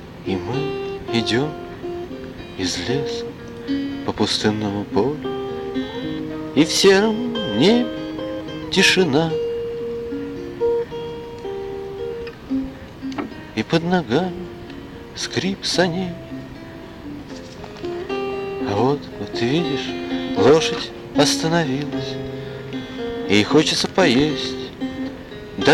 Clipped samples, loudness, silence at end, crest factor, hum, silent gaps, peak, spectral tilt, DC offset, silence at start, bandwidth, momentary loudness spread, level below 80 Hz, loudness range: under 0.1%; -21 LUFS; 0 s; 20 dB; none; none; -2 dBFS; -4.5 dB/octave; under 0.1%; 0 s; 16.5 kHz; 17 LU; -46 dBFS; 7 LU